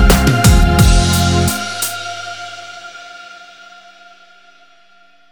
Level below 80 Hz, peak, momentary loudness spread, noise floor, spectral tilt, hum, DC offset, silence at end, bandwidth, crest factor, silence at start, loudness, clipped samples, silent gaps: -18 dBFS; 0 dBFS; 23 LU; -50 dBFS; -4.5 dB/octave; none; under 0.1%; 1.9 s; over 20 kHz; 14 dB; 0 s; -13 LUFS; under 0.1%; none